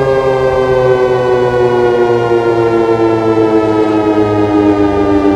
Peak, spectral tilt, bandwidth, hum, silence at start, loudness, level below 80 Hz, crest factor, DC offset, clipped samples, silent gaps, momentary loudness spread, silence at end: 0 dBFS; -7.5 dB/octave; 10 kHz; none; 0 s; -11 LUFS; -34 dBFS; 10 dB; under 0.1%; under 0.1%; none; 1 LU; 0 s